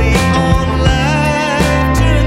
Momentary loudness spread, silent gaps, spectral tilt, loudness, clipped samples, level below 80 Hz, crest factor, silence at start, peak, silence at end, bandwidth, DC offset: 1 LU; none; -5.5 dB/octave; -12 LUFS; under 0.1%; -18 dBFS; 12 dB; 0 s; 0 dBFS; 0 s; 16 kHz; under 0.1%